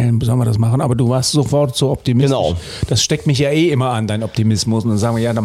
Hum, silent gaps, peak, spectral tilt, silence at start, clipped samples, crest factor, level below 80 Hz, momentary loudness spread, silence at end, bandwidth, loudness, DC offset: none; none; -4 dBFS; -5.5 dB/octave; 0 s; under 0.1%; 10 dB; -38 dBFS; 4 LU; 0 s; 14 kHz; -16 LUFS; under 0.1%